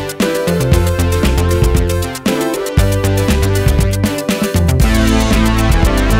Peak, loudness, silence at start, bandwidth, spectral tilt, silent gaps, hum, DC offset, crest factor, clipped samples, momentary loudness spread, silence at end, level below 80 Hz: 0 dBFS; -14 LUFS; 0 s; 16.5 kHz; -5.5 dB/octave; none; none; under 0.1%; 12 dB; under 0.1%; 4 LU; 0 s; -18 dBFS